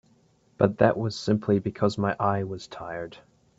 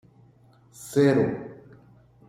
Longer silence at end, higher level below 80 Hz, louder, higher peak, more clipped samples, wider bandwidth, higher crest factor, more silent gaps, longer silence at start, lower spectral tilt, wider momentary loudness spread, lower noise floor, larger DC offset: second, 0.4 s vs 0.75 s; about the same, -60 dBFS vs -64 dBFS; about the same, -26 LUFS vs -24 LUFS; first, -4 dBFS vs -8 dBFS; neither; second, 8 kHz vs 16 kHz; about the same, 22 dB vs 18 dB; neither; second, 0.6 s vs 0.8 s; about the same, -7 dB/octave vs -7 dB/octave; second, 14 LU vs 23 LU; first, -63 dBFS vs -57 dBFS; neither